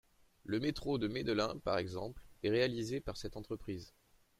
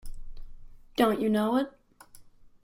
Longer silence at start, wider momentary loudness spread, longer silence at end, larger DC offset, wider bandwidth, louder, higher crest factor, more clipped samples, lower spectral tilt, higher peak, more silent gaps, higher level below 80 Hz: first, 0.45 s vs 0.05 s; about the same, 12 LU vs 13 LU; first, 0.5 s vs 0.15 s; neither; about the same, 15.5 kHz vs 16 kHz; second, -38 LUFS vs -27 LUFS; about the same, 18 dB vs 20 dB; neither; about the same, -5.5 dB/octave vs -6 dB/octave; second, -20 dBFS vs -10 dBFS; neither; second, -58 dBFS vs -46 dBFS